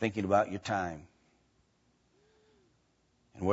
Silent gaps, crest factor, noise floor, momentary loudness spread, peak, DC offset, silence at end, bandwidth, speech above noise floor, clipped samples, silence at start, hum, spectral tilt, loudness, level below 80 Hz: none; 22 dB; -72 dBFS; 11 LU; -14 dBFS; under 0.1%; 0 s; 7.6 kHz; 41 dB; under 0.1%; 0 s; none; -5 dB/octave; -32 LUFS; -66 dBFS